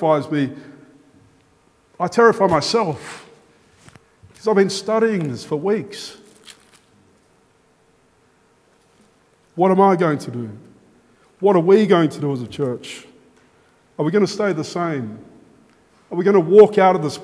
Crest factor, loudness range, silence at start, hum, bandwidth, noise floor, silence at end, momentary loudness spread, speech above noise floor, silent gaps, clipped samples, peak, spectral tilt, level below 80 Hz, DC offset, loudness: 20 dB; 7 LU; 0 s; none; 11 kHz; -58 dBFS; 0 s; 20 LU; 41 dB; none; under 0.1%; 0 dBFS; -6 dB/octave; -62 dBFS; under 0.1%; -17 LUFS